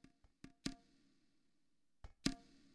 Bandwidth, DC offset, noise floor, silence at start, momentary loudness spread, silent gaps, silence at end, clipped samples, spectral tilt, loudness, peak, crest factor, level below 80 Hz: 11 kHz; under 0.1%; -87 dBFS; 0.45 s; 21 LU; none; 0.3 s; under 0.1%; -3.5 dB/octave; -47 LUFS; -18 dBFS; 34 dB; -64 dBFS